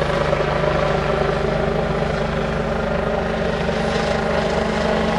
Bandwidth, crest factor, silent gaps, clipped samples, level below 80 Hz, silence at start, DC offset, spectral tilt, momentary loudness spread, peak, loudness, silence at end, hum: 11.5 kHz; 14 dB; none; under 0.1%; -30 dBFS; 0 s; 0.1%; -6 dB/octave; 2 LU; -6 dBFS; -20 LUFS; 0 s; none